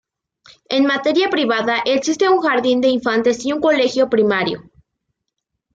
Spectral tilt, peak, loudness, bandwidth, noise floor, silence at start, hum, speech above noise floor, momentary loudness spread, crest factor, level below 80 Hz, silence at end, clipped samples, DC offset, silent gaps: -4 dB/octave; -4 dBFS; -17 LUFS; 8 kHz; -77 dBFS; 0.7 s; none; 61 dB; 3 LU; 14 dB; -60 dBFS; 1.15 s; under 0.1%; under 0.1%; none